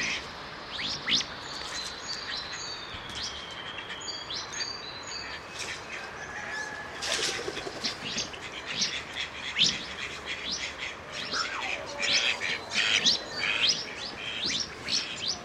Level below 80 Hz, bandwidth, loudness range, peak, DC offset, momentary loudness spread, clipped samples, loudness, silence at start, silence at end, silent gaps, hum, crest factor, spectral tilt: -58 dBFS; 16 kHz; 9 LU; -10 dBFS; under 0.1%; 12 LU; under 0.1%; -30 LUFS; 0 s; 0 s; none; none; 22 dB; -0.5 dB/octave